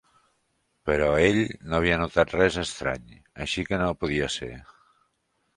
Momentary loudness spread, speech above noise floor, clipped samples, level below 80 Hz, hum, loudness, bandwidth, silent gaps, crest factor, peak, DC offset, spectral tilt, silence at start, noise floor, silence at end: 14 LU; 48 dB; under 0.1%; -44 dBFS; none; -25 LUFS; 11.5 kHz; none; 22 dB; -4 dBFS; under 0.1%; -5 dB/octave; 0.85 s; -73 dBFS; 0.95 s